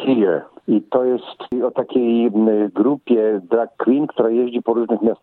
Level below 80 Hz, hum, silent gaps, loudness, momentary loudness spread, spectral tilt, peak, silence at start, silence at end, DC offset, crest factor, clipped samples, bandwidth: -66 dBFS; none; none; -18 LUFS; 5 LU; -10 dB/octave; -4 dBFS; 0 s; 0.05 s; under 0.1%; 14 dB; under 0.1%; 4.2 kHz